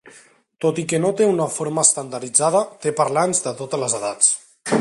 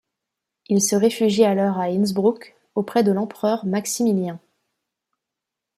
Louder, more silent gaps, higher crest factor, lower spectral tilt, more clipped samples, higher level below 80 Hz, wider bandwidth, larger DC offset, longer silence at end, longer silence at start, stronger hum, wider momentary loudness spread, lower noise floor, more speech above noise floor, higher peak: about the same, -19 LUFS vs -21 LUFS; neither; about the same, 20 dB vs 18 dB; second, -3.5 dB/octave vs -5 dB/octave; neither; about the same, -66 dBFS vs -68 dBFS; second, 11.5 kHz vs 15.5 kHz; neither; second, 0 s vs 1.4 s; second, 0.05 s vs 0.7 s; neither; about the same, 8 LU vs 10 LU; second, -50 dBFS vs -84 dBFS; second, 31 dB vs 65 dB; first, 0 dBFS vs -4 dBFS